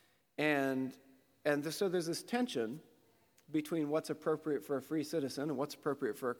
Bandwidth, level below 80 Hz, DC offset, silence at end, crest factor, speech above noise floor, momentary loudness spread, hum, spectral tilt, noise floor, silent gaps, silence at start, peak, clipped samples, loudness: 19.5 kHz; -86 dBFS; under 0.1%; 0 s; 20 dB; 34 dB; 6 LU; none; -5 dB/octave; -70 dBFS; none; 0.4 s; -18 dBFS; under 0.1%; -37 LUFS